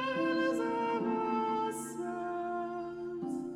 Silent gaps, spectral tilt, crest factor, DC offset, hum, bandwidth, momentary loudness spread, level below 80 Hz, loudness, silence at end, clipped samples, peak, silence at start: none; -5 dB/octave; 14 dB; under 0.1%; none; 15 kHz; 8 LU; -72 dBFS; -34 LUFS; 0 s; under 0.1%; -20 dBFS; 0 s